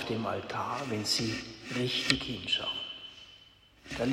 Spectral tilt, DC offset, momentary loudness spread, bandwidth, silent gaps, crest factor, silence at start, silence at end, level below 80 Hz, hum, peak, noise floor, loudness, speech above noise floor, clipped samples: -3.5 dB/octave; under 0.1%; 14 LU; 16 kHz; none; 30 dB; 0 s; 0 s; -58 dBFS; none; -4 dBFS; -59 dBFS; -32 LUFS; 26 dB; under 0.1%